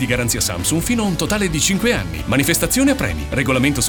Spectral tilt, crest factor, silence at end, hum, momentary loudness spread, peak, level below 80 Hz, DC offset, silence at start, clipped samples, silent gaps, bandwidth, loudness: -4 dB/octave; 16 dB; 0 s; none; 5 LU; -2 dBFS; -32 dBFS; under 0.1%; 0 s; under 0.1%; none; over 20 kHz; -17 LUFS